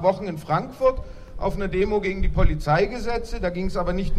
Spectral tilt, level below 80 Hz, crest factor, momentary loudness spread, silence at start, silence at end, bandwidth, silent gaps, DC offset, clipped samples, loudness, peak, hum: -7 dB/octave; -28 dBFS; 18 dB; 8 LU; 0 s; 0 s; 12.5 kHz; none; under 0.1%; under 0.1%; -25 LUFS; -4 dBFS; none